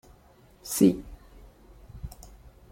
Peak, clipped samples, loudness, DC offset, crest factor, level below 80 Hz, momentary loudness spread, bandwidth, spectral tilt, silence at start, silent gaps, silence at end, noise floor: -8 dBFS; under 0.1%; -25 LUFS; under 0.1%; 22 dB; -50 dBFS; 26 LU; 16.5 kHz; -5.5 dB/octave; 0.65 s; none; 0.65 s; -57 dBFS